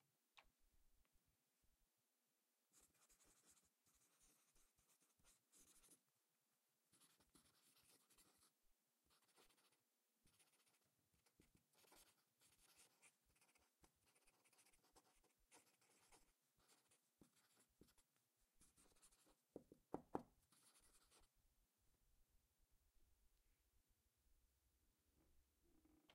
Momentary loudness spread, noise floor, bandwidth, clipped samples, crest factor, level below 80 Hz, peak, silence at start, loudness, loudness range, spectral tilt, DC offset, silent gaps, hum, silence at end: 12 LU; under -90 dBFS; 15.5 kHz; under 0.1%; 42 dB; -88 dBFS; -30 dBFS; 0 s; -59 LUFS; 2 LU; -4 dB/octave; under 0.1%; none; none; 0 s